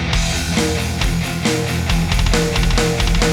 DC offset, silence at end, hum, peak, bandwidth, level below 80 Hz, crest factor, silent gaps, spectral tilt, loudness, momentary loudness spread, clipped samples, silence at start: under 0.1%; 0 s; none; 0 dBFS; 17.5 kHz; -20 dBFS; 16 dB; none; -4.5 dB/octave; -18 LUFS; 3 LU; under 0.1%; 0 s